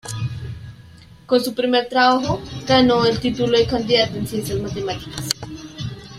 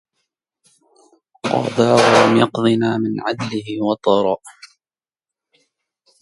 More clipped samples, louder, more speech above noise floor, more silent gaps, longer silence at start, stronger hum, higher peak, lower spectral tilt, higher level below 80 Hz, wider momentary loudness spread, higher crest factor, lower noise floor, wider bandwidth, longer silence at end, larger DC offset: neither; about the same, -19 LUFS vs -17 LUFS; second, 25 dB vs over 74 dB; neither; second, 0.05 s vs 1.45 s; neither; about the same, -2 dBFS vs 0 dBFS; about the same, -5 dB/octave vs -5.5 dB/octave; first, -44 dBFS vs -60 dBFS; first, 16 LU vs 12 LU; about the same, 18 dB vs 18 dB; second, -44 dBFS vs under -90 dBFS; first, 16 kHz vs 11.5 kHz; second, 0 s vs 1.7 s; neither